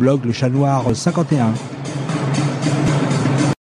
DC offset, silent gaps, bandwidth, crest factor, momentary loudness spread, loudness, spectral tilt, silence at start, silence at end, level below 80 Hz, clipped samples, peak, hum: under 0.1%; none; 10.5 kHz; 14 dB; 6 LU; -18 LUFS; -6.5 dB/octave; 0 s; 0.15 s; -46 dBFS; under 0.1%; -4 dBFS; none